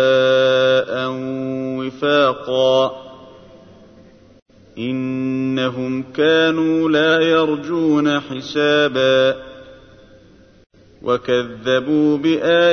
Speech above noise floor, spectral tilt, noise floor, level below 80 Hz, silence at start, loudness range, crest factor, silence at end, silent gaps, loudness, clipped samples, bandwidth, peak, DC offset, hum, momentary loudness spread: 31 dB; -5.5 dB/octave; -48 dBFS; -58 dBFS; 0 s; 6 LU; 14 dB; 0 s; 4.42-4.46 s; -17 LUFS; under 0.1%; 6.6 kHz; -4 dBFS; under 0.1%; none; 10 LU